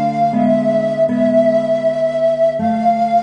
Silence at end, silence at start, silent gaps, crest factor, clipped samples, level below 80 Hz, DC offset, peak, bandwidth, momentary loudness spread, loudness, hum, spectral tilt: 0 s; 0 s; none; 12 dB; under 0.1%; -56 dBFS; under 0.1%; -2 dBFS; 9.2 kHz; 3 LU; -15 LUFS; none; -8 dB/octave